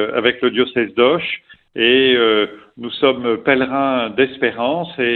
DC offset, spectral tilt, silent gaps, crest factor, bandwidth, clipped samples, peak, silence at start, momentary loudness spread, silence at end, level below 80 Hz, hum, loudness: under 0.1%; -8.5 dB/octave; none; 16 dB; 4.4 kHz; under 0.1%; 0 dBFS; 0 s; 11 LU; 0 s; -56 dBFS; none; -16 LUFS